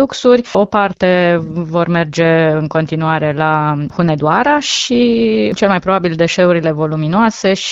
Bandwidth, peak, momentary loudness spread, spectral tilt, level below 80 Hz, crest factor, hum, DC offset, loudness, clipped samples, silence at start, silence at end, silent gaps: 8 kHz; 0 dBFS; 5 LU; -5.5 dB/octave; -46 dBFS; 12 dB; none; under 0.1%; -13 LUFS; under 0.1%; 0 s; 0 s; none